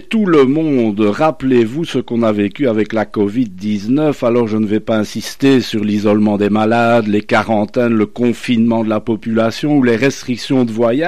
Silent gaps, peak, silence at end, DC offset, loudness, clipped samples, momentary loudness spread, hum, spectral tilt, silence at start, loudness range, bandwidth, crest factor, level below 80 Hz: none; -2 dBFS; 0 s; 2%; -14 LUFS; under 0.1%; 5 LU; none; -6.5 dB/octave; 0.1 s; 2 LU; 13.5 kHz; 12 dB; -50 dBFS